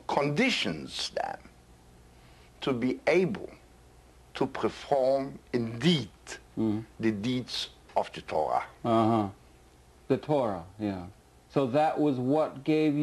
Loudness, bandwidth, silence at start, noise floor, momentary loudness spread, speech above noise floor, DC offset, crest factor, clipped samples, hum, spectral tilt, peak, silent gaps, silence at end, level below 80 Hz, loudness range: -29 LUFS; 12 kHz; 0.1 s; -57 dBFS; 10 LU; 28 dB; under 0.1%; 18 dB; under 0.1%; none; -6 dB/octave; -12 dBFS; none; 0 s; -60 dBFS; 3 LU